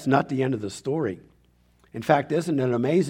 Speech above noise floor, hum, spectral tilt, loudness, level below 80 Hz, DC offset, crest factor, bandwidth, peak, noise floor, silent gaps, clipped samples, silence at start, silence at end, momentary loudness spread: 37 dB; 60 Hz at -55 dBFS; -7 dB/octave; -25 LUFS; -62 dBFS; under 0.1%; 20 dB; 16 kHz; -4 dBFS; -61 dBFS; none; under 0.1%; 0 s; 0 s; 10 LU